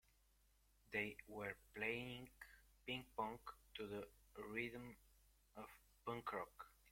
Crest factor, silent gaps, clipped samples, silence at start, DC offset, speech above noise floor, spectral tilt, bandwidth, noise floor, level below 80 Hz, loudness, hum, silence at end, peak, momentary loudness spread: 22 dB; none; under 0.1%; 0.9 s; under 0.1%; 27 dB; -5 dB/octave; 16.5 kHz; -77 dBFS; -74 dBFS; -50 LUFS; none; 0 s; -30 dBFS; 15 LU